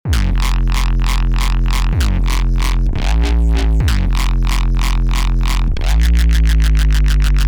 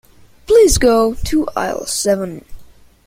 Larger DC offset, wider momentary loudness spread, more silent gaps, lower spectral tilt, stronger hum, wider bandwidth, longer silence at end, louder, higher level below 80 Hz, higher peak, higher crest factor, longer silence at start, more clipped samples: neither; second, 4 LU vs 10 LU; neither; about the same, -5 dB/octave vs -4 dB/octave; neither; about the same, 16 kHz vs 16.5 kHz; second, 0 s vs 0.4 s; about the same, -16 LUFS vs -14 LUFS; first, -12 dBFS vs -30 dBFS; second, -6 dBFS vs 0 dBFS; second, 8 dB vs 14 dB; second, 0.05 s vs 0.5 s; neither